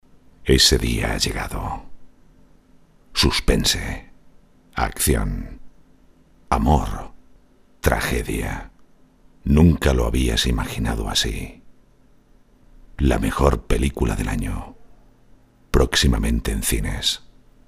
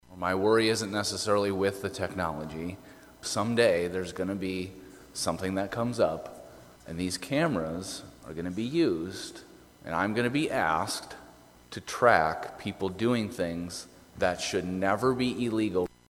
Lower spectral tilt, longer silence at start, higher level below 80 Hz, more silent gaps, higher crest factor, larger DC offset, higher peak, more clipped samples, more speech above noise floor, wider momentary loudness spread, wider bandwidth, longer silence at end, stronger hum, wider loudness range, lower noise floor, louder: about the same, -4.5 dB/octave vs -4.5 dB/octave; first, 0.4 s vs 0.1 s; first, -28 dBFS vs -58 dBFS; neither; about the same, 22 dB vs 24 dB; neither; first, 0 dBFS vs -6 dBFS; neither; first, 33 dB vs 25 dB; about the same, 16 LU vs 16 LU; about the same, 15.5 kHz vs 17 kHz; first, 0.5 s vs 0.25 s; neither; about the same, 4 LU vs 3 LU; about the same, -53 dBFS vs -54 dBFS; first, -21 LUFS vs -29 LUFS